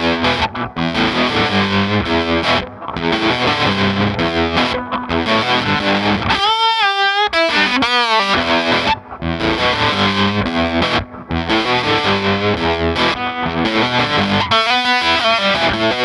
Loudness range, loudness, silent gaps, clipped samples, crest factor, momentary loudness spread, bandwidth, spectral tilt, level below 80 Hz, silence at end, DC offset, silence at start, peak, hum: 2 LU; -15 LUFS; none; under 0.1%; 14 dB; 6 LU; 12 kHz; -5 dB/octave; -40 dBFS; 0 s; under 0.1%; 0 s; -2 dBFS; none